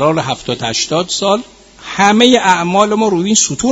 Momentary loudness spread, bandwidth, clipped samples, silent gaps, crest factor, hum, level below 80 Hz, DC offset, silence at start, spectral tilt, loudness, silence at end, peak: 9 LU; 11 kHz; 0.1%; none; 12 dB; none; -46 dBFS; under 0.1%; 0 s; -3 dB/octave; -12 LUFS; 0 s; 0 dBFS